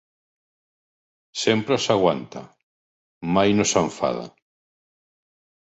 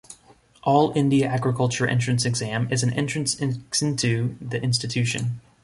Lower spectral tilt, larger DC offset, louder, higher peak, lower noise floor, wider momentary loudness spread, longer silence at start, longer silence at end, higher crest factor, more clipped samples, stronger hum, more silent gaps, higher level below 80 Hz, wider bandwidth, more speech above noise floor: about the same, -4 dB/octave vs -5 dB/octave; neither; about the same, -21 LUFS vs -23 LUFS; about the same, -4 dBFS vs -6 dBFS; first, under -90 dBFS vs -55 dBFS; first, 17 LU vs 7 LU; first, 1.35 s vs 0.1 s; first, 1.4 s vs 0.25 s; about the same, 22 dB vs 18 dB; neither; neither; first, 2.63-3.21 s vs none; about the same, -56 dBFS vs -56 dBFS; second, 8.2 kHz vs 11.5 kHz; first, over 69 dB vs 32 dB